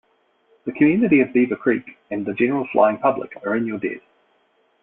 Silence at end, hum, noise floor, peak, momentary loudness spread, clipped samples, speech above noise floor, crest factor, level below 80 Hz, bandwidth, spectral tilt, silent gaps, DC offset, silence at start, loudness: 0.85 s; none; -63 dBFS; -2 dBFS; 13 LU; under 0.1%; 43 dB; 18 dB; -62 dBFS; 3.9 kHz; -11.5 dB/octave; none; under 0.1%; 0.65 s; -20 LUFS